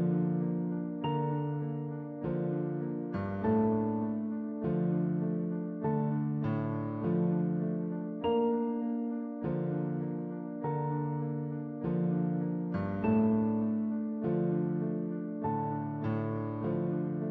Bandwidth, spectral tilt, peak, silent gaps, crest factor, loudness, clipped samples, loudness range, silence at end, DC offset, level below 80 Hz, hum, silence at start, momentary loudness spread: 3.7 kHz; -9.5 dB/octave; -18 dBFS; none; 14 dB; -33 LUFS; under 0.1%; 3 LU; 0 s; under 0.1%; -64 dBFS; none; 0 s; 6 LU